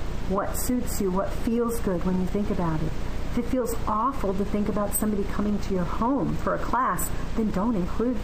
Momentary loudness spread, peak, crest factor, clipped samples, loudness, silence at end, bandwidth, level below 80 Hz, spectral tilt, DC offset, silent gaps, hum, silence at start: 3 LU; -12 dBFS; 12 dB; under 0.1%; -27 LUFS; 0 s; 15.5 kHz; -32 dBFS; -6 dB/octave; 2%; none; none; 0 s